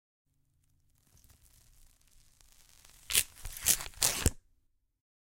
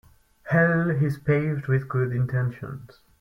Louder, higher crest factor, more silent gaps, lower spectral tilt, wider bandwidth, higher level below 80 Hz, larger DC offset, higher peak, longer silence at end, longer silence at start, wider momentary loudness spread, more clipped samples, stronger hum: second, -30 LUFS vs -24 LUFS; first, 32 dB vs 16 dB; neither; second, -1 dB/octave vs -10 dB/octave; first, 17 kHz vs 5.8 kHz; first, -48 dBFS vs -56 dBFS; neither; first, -4 dBFS vs -10 dBFS; first, 0.9 s vs 0.35 s; first, 3.1 s vs 0.45 s; second, 5 LU vs 13 LU; neither; neither